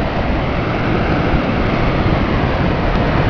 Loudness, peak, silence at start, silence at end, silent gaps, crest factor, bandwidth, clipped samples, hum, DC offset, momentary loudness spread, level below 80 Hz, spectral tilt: -16 LUFS; -2 dBFS; 0 s; 0 s; none; 14 dB; 5.4 kHz; under 0.1%; none; 1%; 2 LU; -22 dBFS; -8 dB/octave